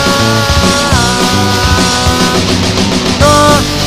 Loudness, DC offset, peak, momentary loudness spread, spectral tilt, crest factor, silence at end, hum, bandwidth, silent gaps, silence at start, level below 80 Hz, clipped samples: -9 LUFS; 2%; 0 dBFS; 4 LU; -4 dB/octave; 10 dB; 0 s; none; 16 kHz; none; 0 s; -22 dBFS; 0.5%